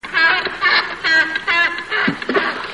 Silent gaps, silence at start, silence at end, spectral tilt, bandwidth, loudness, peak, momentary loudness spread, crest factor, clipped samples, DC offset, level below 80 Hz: none; 0.05 s; 0 s; -3 dB/octave; 11.5 kHz; -16 LUFS; -4 dBFS; 4 LU; 14 dB; under 0.1%; 0.2%; -54 dBFS